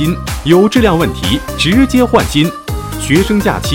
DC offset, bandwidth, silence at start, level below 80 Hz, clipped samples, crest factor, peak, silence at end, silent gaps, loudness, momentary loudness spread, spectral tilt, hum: under 0.1%; 17.5 kHz; 0 s; -26 dBFS; 0.5%; 12 dB; 0 dBFS; 0 s; none; -12 LUFS; 8 LU; -5.5 dB/octave; none